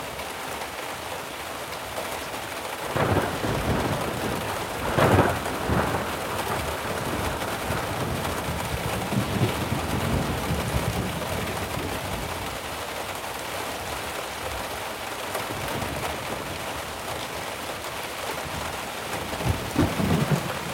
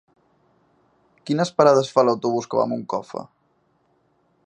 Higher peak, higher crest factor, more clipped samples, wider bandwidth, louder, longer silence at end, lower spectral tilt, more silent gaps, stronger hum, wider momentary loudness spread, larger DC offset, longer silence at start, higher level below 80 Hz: second, -6 dBFS vs -2 dBFS; about the same, 22 dB vs 22 dB; neither; first, 18.5 kHz vs 9.6 kHz; second, -28 LUFS vs -20 LUFS; second, 0 s vs 1.2 s; second, -4.5 dB/octave vs -6 dB/octave; neither; neither; second, 8 LU vs 18 LU; neither; second, 0 s vs 1.25 s; first, -42 dBFS vs -68 dBFS